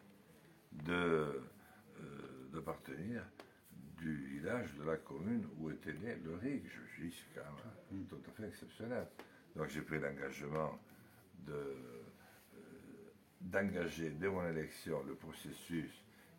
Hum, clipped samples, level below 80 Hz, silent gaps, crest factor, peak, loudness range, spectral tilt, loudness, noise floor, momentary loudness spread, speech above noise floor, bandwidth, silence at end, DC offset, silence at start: none; under 0.1%; -70 dBFS; none; 22 dB; -22 dBFS; 5 LU; -6.5 dB/octave; -44 LUFS; -65 dBFS; 20 LU; 21 dB; 16.5 kHz; 0 s; under 0.1%; 0 s